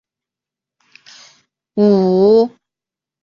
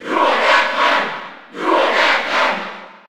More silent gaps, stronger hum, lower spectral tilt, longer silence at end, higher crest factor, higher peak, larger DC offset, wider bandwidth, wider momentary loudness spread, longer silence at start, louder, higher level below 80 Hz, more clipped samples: neither; neither; first, -8.5 dB/octave vs -2 dB/octave; first, 0.75 s vs 0.1 s; about the same, 14 dB vs 16 dB; about the same, -2 dBFS vs -2 dBFS; second, under 0.1% vs 0.8%; second, 7 kHz vs 17.5 kHz; second, 10 LU vs 14 LU; first, 1.75 s vs 0 s; about the same, -13 LUFS vs -15 LUFS; first, -60 dBFS vs -66 dBFS; neither